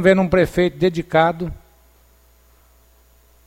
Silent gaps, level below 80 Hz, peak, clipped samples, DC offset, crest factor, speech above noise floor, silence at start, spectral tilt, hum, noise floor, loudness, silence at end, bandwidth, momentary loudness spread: none; -42 dBFS; 0 dBFS; under 0.1%; under 0.1%; 20 dB; 37 dB; 0 s; -7 dB/octave; 60 Hz at -50 dBFS; -53 dBFS; -18 LUFS; 1.9 s; 16 kHz; 10 LU